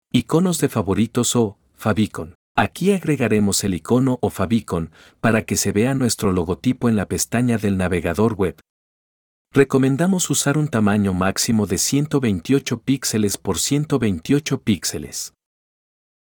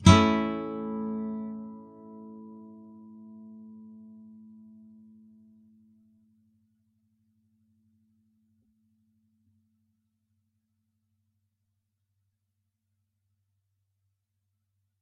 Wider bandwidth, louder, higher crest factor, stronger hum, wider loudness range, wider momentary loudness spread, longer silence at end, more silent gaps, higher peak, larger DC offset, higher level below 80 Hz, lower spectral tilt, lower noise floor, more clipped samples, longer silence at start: first, over 20 kHz vs 6.4 kHz; first, -20 LUFS vs -27 LUFS; second, 18 dB vs 30 dB; neither; second, 2 LU vs 23 LU; second, 6 LU vs 24 LU; second, 0.95 s vs 11.1 s; first, 2.35-2.55 s, 8.70-9.45 s vs none; about the same, -2 dBFS vs -2 dBFS; neither; about the same, -50 dBFS vs -54 dBFS; about the same, -5 dB/octave vs -5.5 dB/octave; first, under -90 dBFS vs -81 dBFS; neither; first, 0.15 s vs 0 s